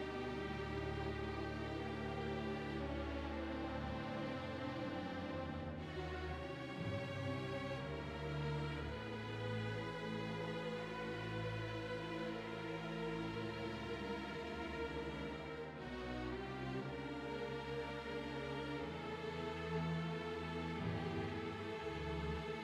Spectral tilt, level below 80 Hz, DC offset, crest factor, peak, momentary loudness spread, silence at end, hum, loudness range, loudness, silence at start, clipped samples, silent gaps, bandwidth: -6.5 dB/octave; -56 dBFS; under 0.1%; 14 dB; -30 dBFS; 3 LU; 0 s; none; 2 LU; -44 LUFS; 0 s; under 0.1%; none; 13 kHz